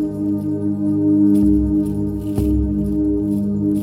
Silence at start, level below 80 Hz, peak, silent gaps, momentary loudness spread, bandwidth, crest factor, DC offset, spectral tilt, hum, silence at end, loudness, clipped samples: 0 s; -30 dBFS; -4 dBFS; none; 7 LU; 14 kHz; 12 dB; under 0.1%; -10.5 dB/octave; 50 Hz at -45 dBFS; 0 s; -18 LUFS; under 0.1%